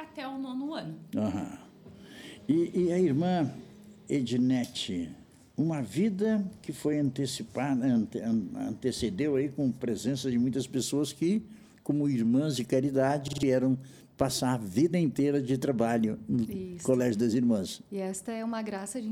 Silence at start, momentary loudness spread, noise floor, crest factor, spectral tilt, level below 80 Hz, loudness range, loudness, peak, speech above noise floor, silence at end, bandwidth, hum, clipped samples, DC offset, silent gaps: 0 s; 10 LU; -50 dBFS; 18 dB; -6 dB/octave; -62 dBFS; 3 LU; -30 LUFS; -12 dBFS; 21 dB; 0 s; 19 kHz; none; under 0.1%; under 0.1%; none